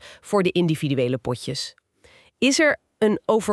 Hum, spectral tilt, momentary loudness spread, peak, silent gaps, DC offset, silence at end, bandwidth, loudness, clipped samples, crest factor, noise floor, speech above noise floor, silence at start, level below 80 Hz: none; -4.5 dB/octave; 10 LU; -6 dBFS; none; under 0.1%; 0 s; 13 kHz; -22 LUFS; under 0.1%; 18 dB; -55 dBFS; 34 dB; 0.05 s; -60 dBFS